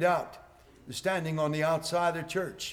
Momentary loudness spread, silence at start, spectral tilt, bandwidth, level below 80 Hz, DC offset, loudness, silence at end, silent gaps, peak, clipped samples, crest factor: 6 LU; 0 s; -4.5 dB/octave; 18.5 kHz; -62 dBFS; under 0.1%; -30 LUFS; 0 s; none; -16 dBFS; under 0.1%; 16 dB